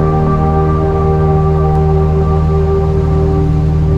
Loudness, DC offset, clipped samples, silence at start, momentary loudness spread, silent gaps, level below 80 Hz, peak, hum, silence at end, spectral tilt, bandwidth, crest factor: -12 LUFS; under 0.1%; under 0.1%; 0 s; 1 LU; none; -16 dBFS; 0 dBFS; none; 0 s; -10 dB/octave; 5.6 kHz; 10 dB